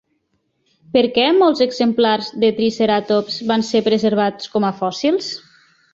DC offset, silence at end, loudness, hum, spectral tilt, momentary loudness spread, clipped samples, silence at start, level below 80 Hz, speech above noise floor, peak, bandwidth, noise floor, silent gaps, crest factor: under 0.1%; 0.55 s; -17 LUFS; none; -5 dB/octave; 6 LU; under 0.1%; 0.95 s; -60 dBFS; 51 dB; -2 dBFS; 7.8 kHz; -68 dBFS; none; 16 dB